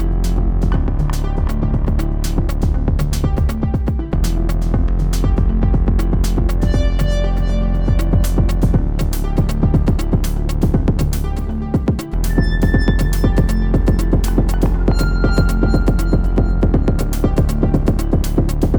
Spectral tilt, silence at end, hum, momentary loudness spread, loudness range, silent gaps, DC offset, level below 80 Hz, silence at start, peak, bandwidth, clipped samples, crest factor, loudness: -7 dB/octave; 0 s; none; 4 LU; 2 LU; none; under 0.1%; -16 dBFS; 0 s; -2 dBFS; over 20 kHz; under 0.1%; 14 dB; -18 LUFS